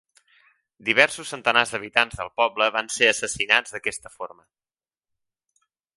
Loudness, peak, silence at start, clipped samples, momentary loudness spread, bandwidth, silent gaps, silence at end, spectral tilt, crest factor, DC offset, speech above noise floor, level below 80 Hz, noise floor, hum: -21 LUFS; 0 dBFS; 0.85 s; under 0.1%; 13 LU; 11.5 kHz; none; 1.7 s; -1.5 dB/octave; 26 dB; under 0.1%; over 67 dB; -58 dBFS; under -90 dBFS; none